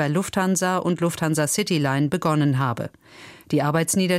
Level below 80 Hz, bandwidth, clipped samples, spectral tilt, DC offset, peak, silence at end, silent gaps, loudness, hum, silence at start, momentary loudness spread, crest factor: -58 dBFS; 16 kHz; under 0.1%; -5 dB/octave; under 0.1%; -8 dBFS; 0 s; none; -22 LUFS; none; 0 s; 4 LU; 14 dB